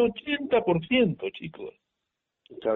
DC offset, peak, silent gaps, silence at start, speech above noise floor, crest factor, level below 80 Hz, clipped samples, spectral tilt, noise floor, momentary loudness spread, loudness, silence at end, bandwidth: under 0.1%; -10 dBFS; none; 0 s; 57 dB; 18 dB; -60 dBFS; under 0.1%; -4 dB/octave; -84 dBFS; 17 LU; -26 LUFS; 0 s; 4.1 kHz